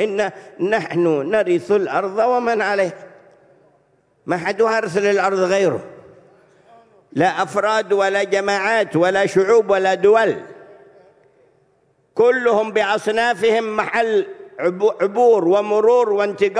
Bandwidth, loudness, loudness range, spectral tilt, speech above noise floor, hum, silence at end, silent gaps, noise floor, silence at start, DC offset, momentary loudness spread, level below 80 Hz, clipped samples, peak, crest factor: 11 kHz; -17 LUFS; 4 LU; -5 dB/octave; 43 dB; none; 0 s; none; -60 dBFS; 0 s; under 0.1%; 8 LU; -64 dBFS; under 0.1%; -4 dBFS; 14 dB